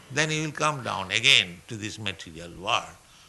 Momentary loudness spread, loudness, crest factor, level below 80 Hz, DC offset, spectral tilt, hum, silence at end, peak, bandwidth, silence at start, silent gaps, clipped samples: 19 LU; -24 LUFS; 24 dB; -60 dBFS; under 0.1%; -2.5 dB/octave; none; 0.3 s; -2 dBFS; 12 kHz; 0.1 s; none; under 0.1%